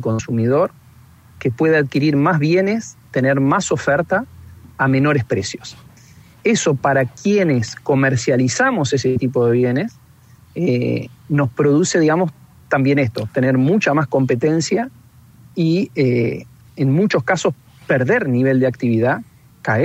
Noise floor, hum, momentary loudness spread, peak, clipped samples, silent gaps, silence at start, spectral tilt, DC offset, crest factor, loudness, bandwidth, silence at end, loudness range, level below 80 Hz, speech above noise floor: -47 dBFS; none; 8 LU; -2 dBFS; under 0.1%; none; 0 s; -6 dB/octave; under 0.1%; 16 dB; -17 LUFS; 9 kHz; 0 s; 2 LU; -54 dBFS; 30 dB